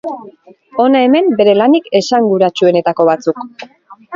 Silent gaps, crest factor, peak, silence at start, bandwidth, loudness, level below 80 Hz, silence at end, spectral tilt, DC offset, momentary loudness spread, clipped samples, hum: none; 12 dB; 0 dBFS; 0.05 s; 7.6 kHz; -11 LUFS; -60 dBFS; 0 s; -5.5 dB/octave; under 0.1%; 15 LU; under 0.1%; none